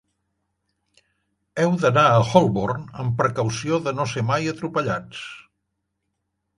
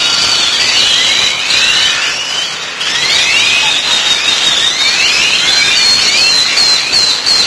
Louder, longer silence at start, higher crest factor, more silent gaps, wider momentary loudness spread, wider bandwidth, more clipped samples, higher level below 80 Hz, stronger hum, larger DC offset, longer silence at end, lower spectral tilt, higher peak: second, -21 LUFS vs -7 LUFS; first, 1.55 s vs 0 s; first, 22 dB vs 10 dB; neither; first, 13 LU vs 6 LU; about the same, 11.5 kHz vs 11 kHz; neither; second, -54 dBFS vs -46 dBFS; neither; neither; first, 1.15 s vs 0 s; first, -6 dB/octave vs 1 dB/octave; about the same, 0 dBFS vs 0 dBFS